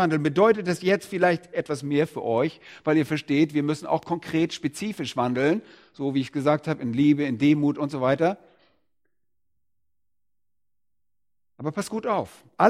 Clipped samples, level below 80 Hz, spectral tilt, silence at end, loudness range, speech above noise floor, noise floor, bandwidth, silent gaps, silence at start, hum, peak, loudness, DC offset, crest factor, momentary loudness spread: under 0.1%; -66 dBFS; -6.5 dB/octave; 0 s; 10 LU; 64 dB; -88 dBFS; 13.5 kHz; none; 0 s; none; -2 dBFS; -25 LUFS; under 0.1%; 22 dB; 9 LU